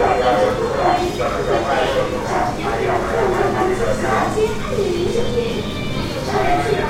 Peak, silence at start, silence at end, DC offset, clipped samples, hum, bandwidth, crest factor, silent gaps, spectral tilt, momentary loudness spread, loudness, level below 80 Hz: -2 dBFS; 0 s; 0 s; under 0.1%; under 0.1%; none; 16 kHz; 16 dB; none; -5.5 dB/octave; 4 LU; -19 LUFS; -32 dBFS